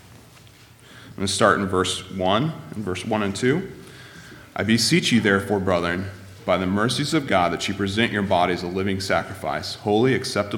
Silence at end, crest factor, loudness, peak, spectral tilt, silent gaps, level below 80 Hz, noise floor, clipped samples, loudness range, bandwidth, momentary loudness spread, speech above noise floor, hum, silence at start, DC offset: 0 s; 20 dB; -22 LUFS; -2 dBFS; -4.5 dB/octave; none; -56 dBFS; -48 dBFS; under 0.1%; 3 LU; 18.5 kHz; 14 LU; 27 dB; none; 0.1 s; under 0.1%